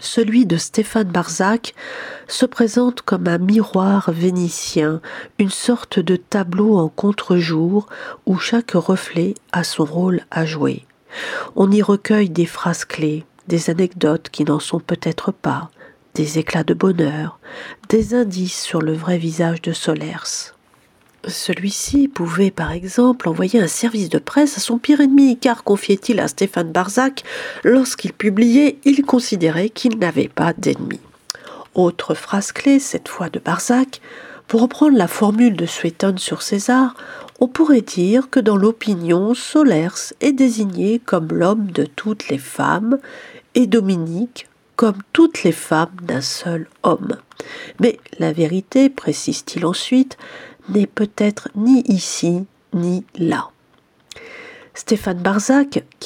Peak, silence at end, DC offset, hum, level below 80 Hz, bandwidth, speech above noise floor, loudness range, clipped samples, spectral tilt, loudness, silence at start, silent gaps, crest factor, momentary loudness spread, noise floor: 0 dBFS; 0 s; under 0.1%; none; -52 dBFS; 16.5 kHz; 39 dB; 4 LU; under 0.1%; -5.5 dB/octave; -17 LUFS; 0 s; none; 18 dB; 12 LU; -56 dBFS